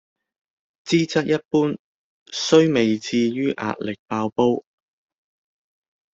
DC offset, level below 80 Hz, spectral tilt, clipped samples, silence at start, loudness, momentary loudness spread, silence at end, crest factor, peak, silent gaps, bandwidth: under 0.1%; -62 dBFS; -5.5 dB/octave; under 0.1%; 0.85 s; -21 LUFS; 12 LU; 1.55 s; 20 dB; -2 dBFS; 1.45-1.51 s, 1.79-2.26 s, 3.99-4.06 s; 8 kHz